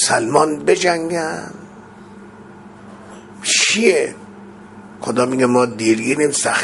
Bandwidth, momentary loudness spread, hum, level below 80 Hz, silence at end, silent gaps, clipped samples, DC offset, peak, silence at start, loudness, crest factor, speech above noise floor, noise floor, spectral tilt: 11.5 kHz; 24 LU; none; -58 dBFS; 0 s; none; under 0.1%; under 0.1%; 0 dBFS; 0 s; -16 LUFS; 18 dB; 23 dB; -39 dBFS; -3 dB/octave